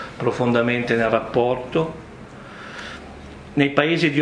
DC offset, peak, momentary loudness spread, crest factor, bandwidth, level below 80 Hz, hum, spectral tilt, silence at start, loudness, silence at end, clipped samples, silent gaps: under 0.1%; 0 dBFS; 20 LU; 22 dB; 10.5 kHz; -50 dBFS; none; -6.5 dB/octave; 0 s; -20 LUFS; 0 s; under 0.1%; none